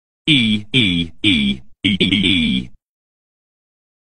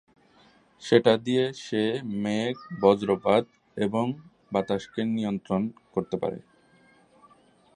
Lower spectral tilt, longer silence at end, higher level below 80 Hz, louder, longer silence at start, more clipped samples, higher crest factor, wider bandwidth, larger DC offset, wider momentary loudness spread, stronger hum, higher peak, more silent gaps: second, -5 dB/octave vs -6.5 dB/octave; second, 1.1 s vs 1.4 s; first, -42 dBFS vs -64 dBFS; first, -16 LUFS vs -26 LUFS; second, 0.25 s vs 0.8 s; neither; second, 18 dB vs 24 dB; about the same, 9.8 kHz vs 10 kHz; first, 1% vs under 0.1%; second, 7 LU vs 10 LU; neither; first, 0 dBFS vs -4 dBFS; first, 2.83-2.87 s vs none